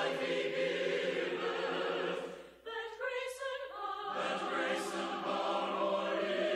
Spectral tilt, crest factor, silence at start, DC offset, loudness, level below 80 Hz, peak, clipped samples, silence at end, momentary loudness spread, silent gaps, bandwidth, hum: -3.5 dB/octave; 14 dB; 0 s; under 0.1%; -36 LUFS; -74 dBFS; -22 dBFS; under 0.1%; 0 s; 7 LU; none; 15 kHz; none